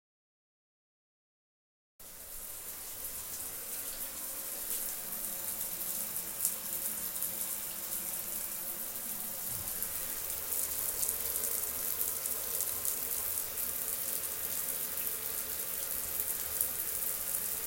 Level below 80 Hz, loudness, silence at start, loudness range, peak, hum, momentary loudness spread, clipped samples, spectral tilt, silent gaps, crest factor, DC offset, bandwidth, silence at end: -62 dBFS; -34 LUFS; 2 s; 8 LU; -10 dBFS; none; 7 LU; under 0.1%; -0.5 dB/octave; none; 28 dB; under 0.1%; 17 kHz; 0 s